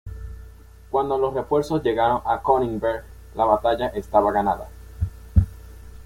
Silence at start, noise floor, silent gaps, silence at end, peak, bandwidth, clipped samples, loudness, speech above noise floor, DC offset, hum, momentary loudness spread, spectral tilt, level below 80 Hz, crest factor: 0.05 s; -44 dBFS; none; 0 s; -4 dBFS; 16.5 kHz; under 0.1%; -23 LUFS; 23 dB; under 0.1%; none; 16 LU; -7.5 dB/octave; -34 dBFS; 20 dB